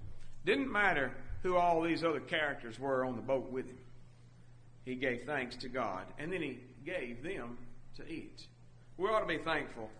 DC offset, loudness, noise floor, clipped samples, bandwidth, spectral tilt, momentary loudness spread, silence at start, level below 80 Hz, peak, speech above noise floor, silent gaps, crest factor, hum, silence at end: under 0.1%; -36 LUFS; -56 dBFS; under 0.1%; 10 kHz; -5.5 dB/octave; 19 LU; 0 s; -54 dBFS; -16 dBFS; 20 dB; none; 20 dB; none; 0 s